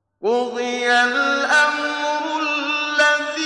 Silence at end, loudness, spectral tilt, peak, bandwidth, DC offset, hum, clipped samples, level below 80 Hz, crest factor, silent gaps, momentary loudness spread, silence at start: 0 s; -18 LUFS; -1 dB/octave; -4 dBFS; 11.5 kHz; under 0.1%; none; under 0.1%; -74 dBFS; 14 dB; none; 6 LU; 0.2 s